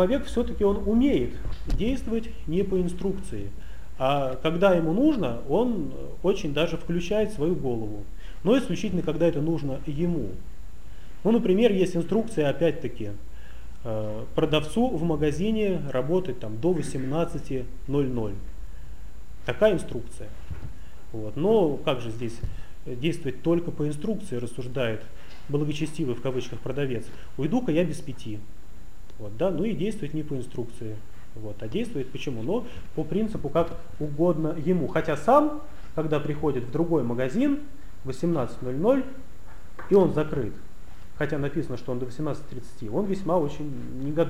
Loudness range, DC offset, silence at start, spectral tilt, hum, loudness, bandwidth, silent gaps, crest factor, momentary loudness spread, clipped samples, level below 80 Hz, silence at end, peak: 5 LU; 3%; 0 s; -7 dB/octave; none; -27 LUFS; 15.5 kHz; none; 20 dB; 18 LU; under 0.1%; -42 dBFS; 0 s; -6 dBFS